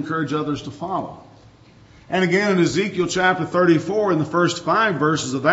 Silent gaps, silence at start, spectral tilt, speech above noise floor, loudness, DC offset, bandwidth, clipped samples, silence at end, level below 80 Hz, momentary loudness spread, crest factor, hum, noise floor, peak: none; 0 s; -5 dB/octave; 29 dB; -20 LUFS; under 0.1%; 8 kHz; under 0.1%; 0 s; -56 dBFS; 10 LU; 18 dB; none; -48 dBFS; -2 dBFS